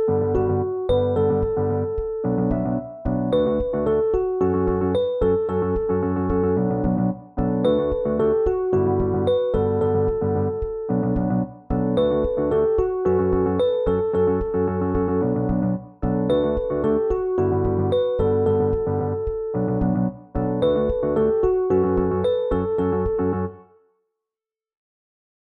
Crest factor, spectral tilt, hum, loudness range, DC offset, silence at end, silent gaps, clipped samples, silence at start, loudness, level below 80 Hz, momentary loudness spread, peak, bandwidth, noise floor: 12 dB; -10.5 dB/octave; none; 1 LU; under 0.1%; 1.8 s; none; under 0.1%; 0 s; -22 LUFS; -36 dBFS; 5 LU; -8 dBFS; 4 kHz; -90 dBFS